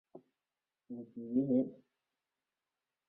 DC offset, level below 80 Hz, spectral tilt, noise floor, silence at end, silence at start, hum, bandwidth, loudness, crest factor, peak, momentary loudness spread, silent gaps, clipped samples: under 0.1%; -82 dBFS; -12.5 dB/octave; under -90 dBFS; 1.35 s; 0.15 s; none; 2.3 kHz; -35 LUFS; 20 dB; -22 dBFS; 17 LU; none; under 0.1%